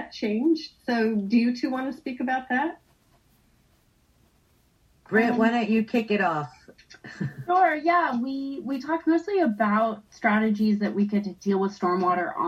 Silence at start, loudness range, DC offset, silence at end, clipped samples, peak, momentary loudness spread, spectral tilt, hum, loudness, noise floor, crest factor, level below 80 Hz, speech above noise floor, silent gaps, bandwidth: 0 s; 6 LU; under 0.1%; 0 s; under 0.1%; -8 dBFS; 10 LU; -7 dB/octave; none; -25 LUFS; -63 dBFS; 18 dB; -66 dBFS; 39 dB; none; 7.8 kHz